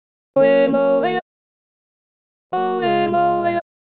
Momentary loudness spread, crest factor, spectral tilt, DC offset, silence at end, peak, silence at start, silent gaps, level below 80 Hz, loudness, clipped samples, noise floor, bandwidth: 10 LU; 16 dB; -9.5 dB/octave; 0.3%; 0.35 s; -4 dBFS; 0.35 s; 1.22-2.50 s; -68 dBFS; -18 LUFS; under 0.1%; under -90 dBFS; 4.5 kHz